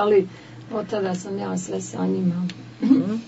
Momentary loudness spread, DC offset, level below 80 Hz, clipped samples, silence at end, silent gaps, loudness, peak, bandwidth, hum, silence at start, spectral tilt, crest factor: 12 LU; under 0.1%; -66 dBFS; under 0.1%; 0 s; none; -24 LUFS; -4 dBFS; 8 kHz; none; 0 s; -6.5 dB/octave; 18 dB